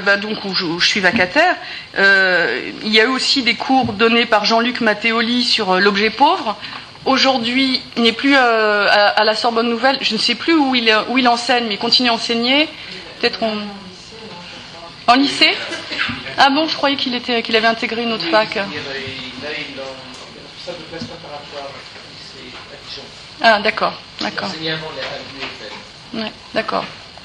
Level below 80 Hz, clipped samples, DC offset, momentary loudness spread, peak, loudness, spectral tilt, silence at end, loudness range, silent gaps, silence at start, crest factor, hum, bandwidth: -54 dBFS; under 0.1%; under 0.1%; 19 LU; 0 dBFS; -15 LUFS; -3.5 dB/octave; 0 s; 10 LU; none; 0 s; 18 dB; none; 11 kHz